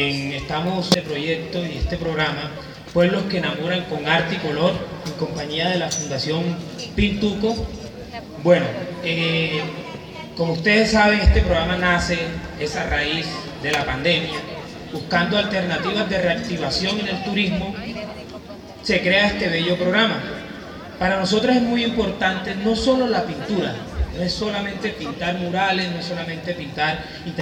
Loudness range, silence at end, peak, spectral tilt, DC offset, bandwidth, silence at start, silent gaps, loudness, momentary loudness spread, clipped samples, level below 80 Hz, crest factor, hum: 4 LU; 0 s; 0 dBFS; -5 dB/octave; under 0.1%; 16.5 kHz; 0 s; none; -21 LUFS; 13 LU; under 0.1%; -34 dBFS; 22 dB; none